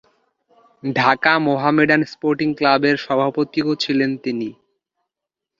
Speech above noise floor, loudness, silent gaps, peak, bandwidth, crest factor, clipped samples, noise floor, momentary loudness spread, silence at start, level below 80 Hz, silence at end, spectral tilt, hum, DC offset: 66 dB; -18 LUFS; none; 0 dBFS; 7.4 kHz; 20 dB; under 0.1%; -84 dBFS; 9 LU; 0.85 s; -62 dBFS; 1.1 s; -6 dB/octave; none; under 0.1%